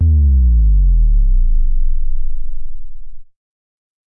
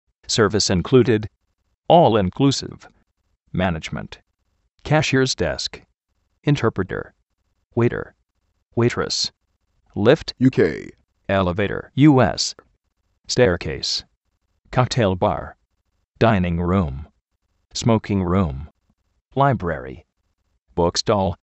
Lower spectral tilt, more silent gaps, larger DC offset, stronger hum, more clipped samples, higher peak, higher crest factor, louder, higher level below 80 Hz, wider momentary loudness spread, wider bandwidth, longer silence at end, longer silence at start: first, -15 dB/octave vs -5.5 dB/octave; second, none vs 1.77-1.82 s, 7.23-7.27 s, 7.66-7.70 s, 14.17-14.21 s, 16.08-16.12 s; neither; neither; neither; second, -6 dBFS vs 0 dBFS; second, 6 dB vs 22 dB; first, -16 LUFS vs -20 LUFS; first, -12 dBFS vs -44 dBFS; first, 20 LU vs 15 LU; second, 0.5 kHz vs 8.4 kHz; first, 0.9 s vs 0.1 s; second, 0 s vs 0.3 s